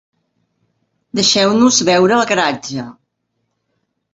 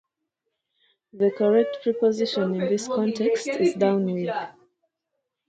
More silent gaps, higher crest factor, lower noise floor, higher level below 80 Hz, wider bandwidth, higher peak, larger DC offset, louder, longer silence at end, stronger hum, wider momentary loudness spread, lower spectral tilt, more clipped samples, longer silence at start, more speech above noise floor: neither; about the same, 16 dB vs 16 dB; second, -70 dBFS vs -81 dBFS; first, -58 dBFS vs -72 dBFS; second, 8 kHz vs 9.2 kHz; first, 0 dBFS vs -8 dBFS; neither; first, -13 LUFS vs -24 LUFS; first, 1.2 s vs 1 s; neither; first, 15 LU vs 7 LU; second, -3 dB/octave vs -6 dB/octave; neither; about the same, 1.15 s vs 1.15 s; about the same, 57 dB vs 58 dB